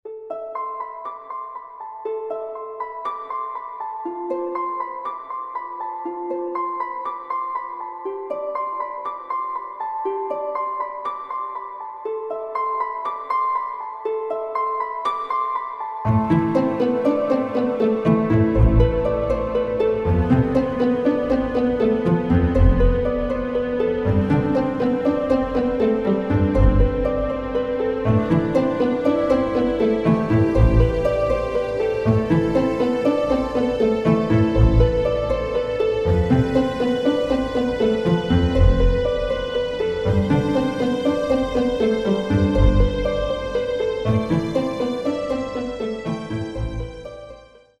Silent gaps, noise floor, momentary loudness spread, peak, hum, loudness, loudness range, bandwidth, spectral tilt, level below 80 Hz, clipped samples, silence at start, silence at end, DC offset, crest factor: none; -44 dBFS; 12 LU; -2 dBFS; none; -21 LUFS; 8 LU; 9.4 kHz; -8.5 dB/octave; -28 dBFS; under 0.1%; 0.05 s; 0.35 s; under 0.1%; 18 dB